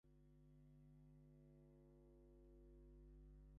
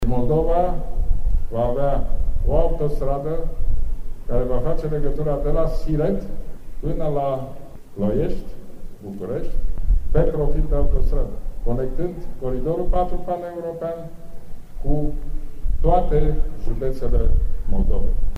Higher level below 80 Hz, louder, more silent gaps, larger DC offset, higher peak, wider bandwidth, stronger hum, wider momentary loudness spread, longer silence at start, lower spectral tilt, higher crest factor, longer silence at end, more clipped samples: second, -70 dBFS vs -22 dBFS; second, -69 LUFS vs -25 LUFS; neither; neither; second, -58 dBFS vs -4 dBFS; about the same, 3.3 kHz vs 3.3 kHz; first, 50 Hz at -70 dBFS vs none; second, 3 LU vs 14 LU; about the same, 0.05 s vs 0 s; about the same, -10.5 dB/octave vs -9.5 dB/octave; about the same, 10 dB vs 14 dB; about the same, 0 s vs 0 s; neither